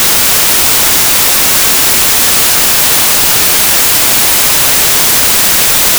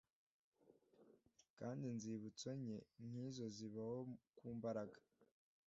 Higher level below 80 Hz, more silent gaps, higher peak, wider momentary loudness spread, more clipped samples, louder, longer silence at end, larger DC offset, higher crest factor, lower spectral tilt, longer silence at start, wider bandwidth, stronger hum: first, -34 dBFS vs -86 dBFS; second, none vs 1.50-1.57 s; first, 0 dBFS vs -34 dBFS; second, 0 LU vs 7 LU; neither; first, -5 LUFS vs -51 LUFS; second, 0 s vs 0.4 s; neither; second, 8 dB vs 18 dB; second, 0 dB/octave vs -7 dB/octave; second, 0 s vs 0.65 s; first, over 20 kHz vs 7.6 kHz; neither